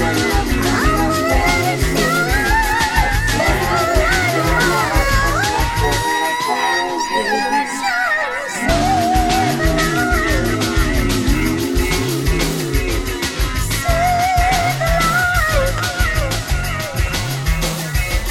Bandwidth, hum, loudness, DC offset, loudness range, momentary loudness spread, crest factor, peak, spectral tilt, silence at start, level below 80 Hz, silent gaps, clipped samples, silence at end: 17 kHz; none; -16 LUFS; 0.3%; 3 LU; 5 LU; 16 dB; 0 dBFS; -4 dB/octave; 0 s; -22 dBFS; none; under 0.1%; 0 s